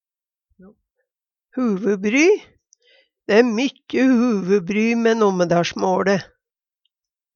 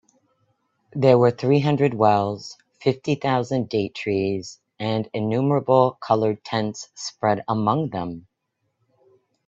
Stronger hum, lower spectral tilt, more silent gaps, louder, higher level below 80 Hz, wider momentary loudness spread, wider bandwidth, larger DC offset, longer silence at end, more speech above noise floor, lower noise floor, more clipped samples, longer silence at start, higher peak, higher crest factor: neither; about the same, -5.5 dB/octave vs -6.5 dB/octave; neither; first, -18 LUFS vs -22 LUFS; about the same, -64 dBFS vs -62 dBFS; second, 7 LU vs 13 LU; about the same, 7.2 kHz vs 7.8 kHz; neither; second, 1.1 s vs 1.3 s; first, over 72 dB vs 54 dB; first, under -90 dBFS vs -75 dBFS; neither; first, 1.55 s vs 0.95 s; about the same, 0 dBFS vs -2 dBFS; about the same, 20 dB vs 20 dB